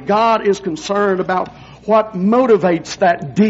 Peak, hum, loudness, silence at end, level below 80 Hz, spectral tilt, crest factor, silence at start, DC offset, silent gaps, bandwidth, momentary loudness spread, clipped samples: -2 dBFS; none; -15 LUFS; 0 s; -52 dBFS; -5 dB/octave; 12 dB; 0 s; under 0.1%; none; 8 kHz; 8 LU; under 0.1%